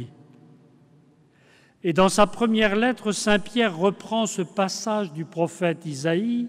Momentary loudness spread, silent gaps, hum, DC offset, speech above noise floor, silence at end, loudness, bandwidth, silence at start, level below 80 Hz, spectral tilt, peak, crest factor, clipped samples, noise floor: 8 LU; none; none; under 0.1%; 34 dB; 0 s; -23 LUFS; 15 kHz; 0 s; -52 dBFS; -4.5 dB/octave; -8 dBFS; 18 dB; under 0.1%; -57 dBFS